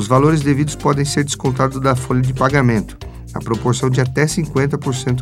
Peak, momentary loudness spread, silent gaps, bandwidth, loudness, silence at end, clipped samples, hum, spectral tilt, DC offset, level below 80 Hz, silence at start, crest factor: 0 dBFS; 7 LU; none; 14 kHz; -17 LUFS; 0 s; under 0.1%; none; -6 dB/octave; under 0.1%; -36 dBFS; 0 s; 16 dB